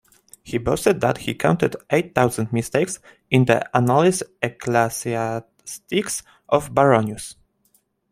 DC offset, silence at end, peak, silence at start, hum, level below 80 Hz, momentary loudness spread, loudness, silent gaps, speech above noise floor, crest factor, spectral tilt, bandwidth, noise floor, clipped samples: under 0.1%; 0.8 s; -2 dBFS; 0.45 s; none; -52 dBFS; 12 LU; -21 LUFS; none; 44 dB; 20 dB; -5.5 dB/octave; 16 kHz; -64 dBFS; under 0.1%